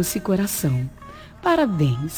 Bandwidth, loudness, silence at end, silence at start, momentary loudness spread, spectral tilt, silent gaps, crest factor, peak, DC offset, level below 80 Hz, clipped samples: over 20 kHz; -22 LUFS; 0 s; 0 s; 16 LU; -5.5 dB/octave; none; 16 dB; -6 dBFS; under 0.1%; -46 dBFS; under 0.1%